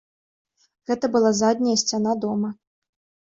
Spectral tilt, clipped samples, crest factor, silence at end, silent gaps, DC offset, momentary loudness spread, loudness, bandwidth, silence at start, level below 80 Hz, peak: -4 dB/octave; under 0.1%; 18 dB; 0.75 s; none; under 0.1%; 10 LU; -22 LUFS; 7.8 kHz; 0.9 s; -66 dBFS; -6 dBFS